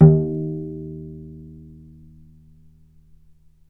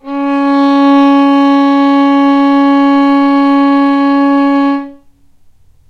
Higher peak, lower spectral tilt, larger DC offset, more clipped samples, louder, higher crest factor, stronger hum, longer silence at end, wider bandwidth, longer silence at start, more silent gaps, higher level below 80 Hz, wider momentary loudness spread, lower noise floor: about the same, 0 dBFS vs 0 dBFS; first, -14.5 dB/octave vs -5 dB/octave; neither; neither; second, -22 LUFS vs -9 LUFS; first, 22 dB vs 8 dB; neither; first, 2.25 s vs 0.95 s; second, 1.9 kHz vs 6 kHz; about the same, 0 s vs 0.05 s; neither; first, -44 dBFS vs -52 dBFS; first, 25 LU vs 4 LU; first, -52 dBFS vs -43 dBFS